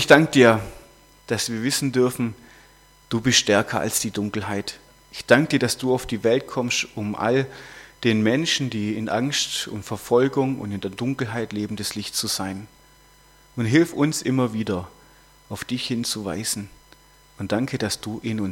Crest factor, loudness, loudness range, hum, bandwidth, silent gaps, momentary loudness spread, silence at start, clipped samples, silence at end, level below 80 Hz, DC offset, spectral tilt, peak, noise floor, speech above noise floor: 24 dB; -22 LUFS; 6 LU; none; 17 kHz; none; 13 LU; 0 s; under 0.1%; 0 s; -54 dBFS; under 0.1%; -4 dB/octave; 0 dBFS; -53 dBFS; 31 dB